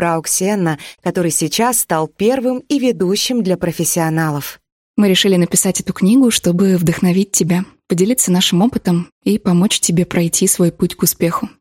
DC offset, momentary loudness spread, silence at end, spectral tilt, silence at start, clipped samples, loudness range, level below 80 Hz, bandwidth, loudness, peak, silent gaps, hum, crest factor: under 0.1%; 6 LU; 0.1 s; -4.5 dB/octave; 0 s; under 0.1%; 2 LU; -48 dBFS; 17 kHz; -15 LUFS; 0 dBFS; 4.72-4.94 s, 9.12-9.21 s; none; 14 dB